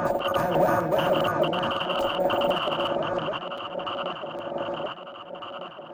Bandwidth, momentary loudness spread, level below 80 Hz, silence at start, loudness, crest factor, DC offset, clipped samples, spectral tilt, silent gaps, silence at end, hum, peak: 17 kHz; 14 LU; -56 dBFS; 0 s; -26 LUFS; 16 dB; under 0.1%; under 0.1%; -5.5 dB/octave; none; 0 s; none; -10 dBFS